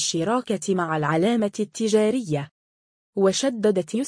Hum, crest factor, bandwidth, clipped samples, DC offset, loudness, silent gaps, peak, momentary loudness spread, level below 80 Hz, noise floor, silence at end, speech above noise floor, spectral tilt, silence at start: none; 16 dB; 10.5 kHz; under 0.1%; under 0.1%; -23 LUFS; 2.51-3.13 s; -8 dBFS; 7 LU; -66 dBFS; under -90 dBFS; 0 s; over 68 dB; -4.5 dB/octave; 0 s